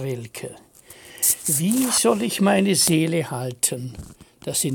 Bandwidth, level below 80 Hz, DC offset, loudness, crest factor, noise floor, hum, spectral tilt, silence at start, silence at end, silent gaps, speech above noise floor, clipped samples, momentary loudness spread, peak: 17 kHz; -54 dBFS; under 0.1%; -20 LUFS; 18 dB; -45 dBFS; none; -3.5 dB/octave; 0 s; 0 s; none; 24 dB; under 0.1%; 18 LU; -4 dBFS